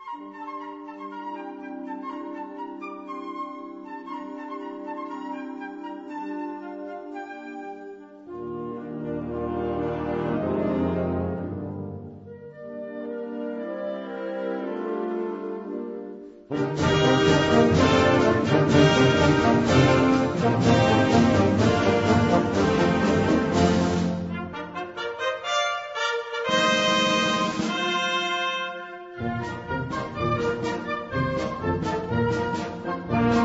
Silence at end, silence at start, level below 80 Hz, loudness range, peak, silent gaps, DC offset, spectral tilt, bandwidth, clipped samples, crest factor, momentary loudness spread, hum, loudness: 0 s; 0 s; -48 dBFS; 16 LU; -6 dBFS; none; under 0.1%; -5.5 dB/octave; 8 kHz; under 0.1%; 20 dB; 18 LU; none; -24 LUFS